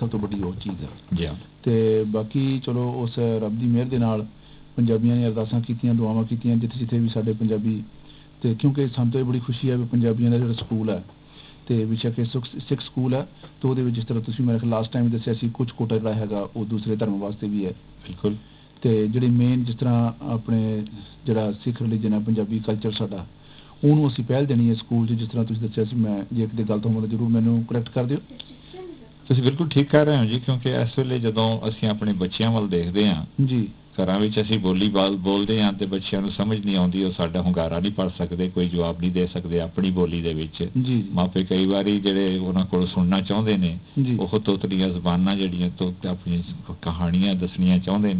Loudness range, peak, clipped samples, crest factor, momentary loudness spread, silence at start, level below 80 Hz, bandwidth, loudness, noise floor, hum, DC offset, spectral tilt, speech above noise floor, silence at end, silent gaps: 3 LU; -4 dBFS; under 0.1%; 18 dB; 8 LU; 0 s; -46 dBFS; 4 kHz; -23 LUFS; -46 dBFS; none; under 0.1%; -12 dB/octave; 24 dB; 0 s; none